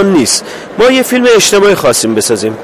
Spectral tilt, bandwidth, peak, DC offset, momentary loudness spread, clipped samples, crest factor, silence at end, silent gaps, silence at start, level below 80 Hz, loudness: -3 dB/octave; 16 kHz; 0 dBFS; under 0.1%; 6 LU; 0.2%; 8 dB; 0 s; none; 0 s; -42 dBFS; -8 LUFS